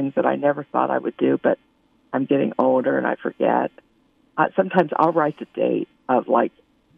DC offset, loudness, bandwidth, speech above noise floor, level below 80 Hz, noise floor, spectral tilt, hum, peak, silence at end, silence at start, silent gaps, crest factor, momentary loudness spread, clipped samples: under 0.1%; -21 LUFS; 5 kHz; 40 dB; -72 dBFS; -61 dBFS; -9.5 dB/octave; none; -2 dBFS; 0.5 s; 0 s; none; 18 dB; 8 LU; under 0.1%